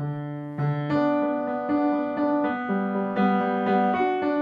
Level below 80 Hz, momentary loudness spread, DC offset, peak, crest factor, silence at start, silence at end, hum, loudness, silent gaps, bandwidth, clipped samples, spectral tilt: -66 dBFS; 5 LU; under 0.1%; -10 dBFS; 14 dB; 0 s; 0 s; none; -25 LUFS; none; 5.2 kHz; under 0.1%; -9.5 dB/octave